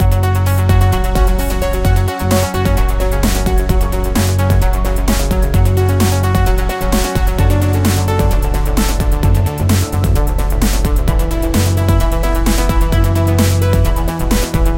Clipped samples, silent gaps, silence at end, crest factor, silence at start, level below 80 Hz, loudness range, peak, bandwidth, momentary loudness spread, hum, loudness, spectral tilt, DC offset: under 0.1%; none; 0 s; 12 dB; 0 s; -16 dBFS; 1 LU; 0 dBFS; 17 kHz; 3 LU; none; -15 LUFS; -6 dB/octave; under 0.1%